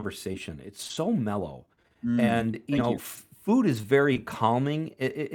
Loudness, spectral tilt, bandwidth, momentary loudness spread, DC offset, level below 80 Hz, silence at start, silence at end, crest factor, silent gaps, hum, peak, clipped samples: -27 LUFS; -6.5 dB/octave; 19.5 kHz; 13 LU; under 0.1%; -62 dBFS; 0 s; 0 s; 20 dB; none; none; -8 dBFS; under 0.1%